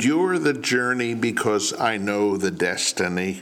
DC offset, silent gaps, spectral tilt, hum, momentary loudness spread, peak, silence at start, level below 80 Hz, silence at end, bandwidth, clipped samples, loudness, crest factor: under 0.1%; none; -3.5 dB/octave; none; 3 LU; -8 dBFS; 0 s; -66 dBFS; 0 s; 17 kHz; under 0.1%; -22 LUFS; 16 dB